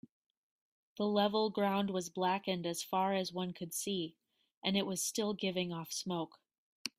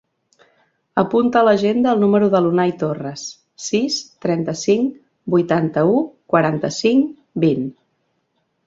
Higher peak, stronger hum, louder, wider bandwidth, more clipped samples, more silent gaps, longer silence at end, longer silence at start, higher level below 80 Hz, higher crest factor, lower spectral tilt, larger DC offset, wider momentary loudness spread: second, -16 dBFS vs -2 dBFS; neither; second, -36 LUFS vs -18 LUFS; first, 16 kHz vs 7.8 kHz; neither; first, 4.57-4.62 s, 6.58-6.85 s vs none; second, 0.1 s vs 0.95 s; about the same, 0.95 s vs 0.95 s; second, -78 dBFS vs -60 dBFS; about the same, 20 dB vs 16 dB; second, -4 dB/octave vs -6 dB/octave; neither; about the same, 8 LU vs 10 LU